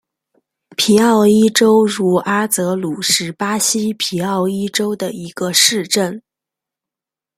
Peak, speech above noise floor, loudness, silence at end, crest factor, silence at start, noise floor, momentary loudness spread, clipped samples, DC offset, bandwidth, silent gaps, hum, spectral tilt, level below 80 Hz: 0 dBFS; 73 dB; -15 LUFS; 1.2 s; 16 dB; 0.8 s; -88 dBFS; 10 LU; under 0.1%; under 0.1%; 16 kHz; none; none; -3.5 dB/octave; -60 dBFS